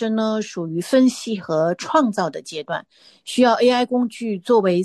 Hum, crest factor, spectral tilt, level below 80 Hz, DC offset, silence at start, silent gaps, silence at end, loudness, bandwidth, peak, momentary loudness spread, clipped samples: none; 16 dB; -5 dB/octave; -68 dBFS; under 0.1%; 0 s; none; 0 s; -20 LUFS; 12.5 kHz; -4 dBFS; 11 LU; under 0.1%